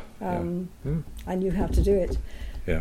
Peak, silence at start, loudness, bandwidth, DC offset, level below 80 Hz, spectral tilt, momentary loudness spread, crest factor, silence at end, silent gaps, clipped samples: -10 dBFS; 0 s; -28 LUFS; 15.5 kHz; under 0.1%; -32 dBFS; -8 dB/octave; 10 LU; 16 dB; 0 s; none; under 0.1%